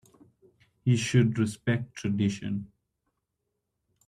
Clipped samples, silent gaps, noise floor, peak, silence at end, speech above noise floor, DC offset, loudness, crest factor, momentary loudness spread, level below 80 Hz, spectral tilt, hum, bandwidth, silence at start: under 0.1%; none; -82 dBFS; -10 dBFS; 1.4 s; 55 dB; under 0.1%; -28 LUFS; 20 dB; 10 LU; -64 dBFS; -6 dB/octave; none; 11.5 kHz; 0.85 s